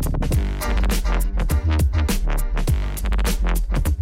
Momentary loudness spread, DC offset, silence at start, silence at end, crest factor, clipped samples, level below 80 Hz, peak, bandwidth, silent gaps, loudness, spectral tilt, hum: 4 LU; under 0.1%; 0 s; 0 s; 12 dB; under 0.1%; -20 dBFS; -8 dBFS; 16.5 kHz; none; -23 LUFS; -5.5 dB/octave; none